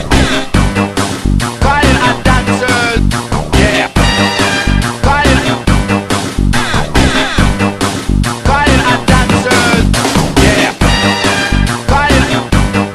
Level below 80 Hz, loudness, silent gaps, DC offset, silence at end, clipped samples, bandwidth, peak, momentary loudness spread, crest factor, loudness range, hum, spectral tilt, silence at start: -18 dBFS; -11 LUFS; none; under 0.1%; 0 s; 0.3%; 14 kHz; 0 dBFS; 5 LU; 10 dB; 2 LU; none; -4.5 dB/octave; 0 s